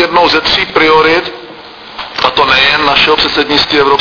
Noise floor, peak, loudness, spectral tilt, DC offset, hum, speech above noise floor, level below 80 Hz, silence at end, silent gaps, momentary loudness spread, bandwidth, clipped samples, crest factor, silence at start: -30 dBFS; 0 dBFS; -8 LUFS; -3.5 dB/octave; under 0.1%; none; 21 dB; -36 dBFS; 0 s; none; 15 LU; 5.4 kHz; 0.7%; 10 dB; 0 s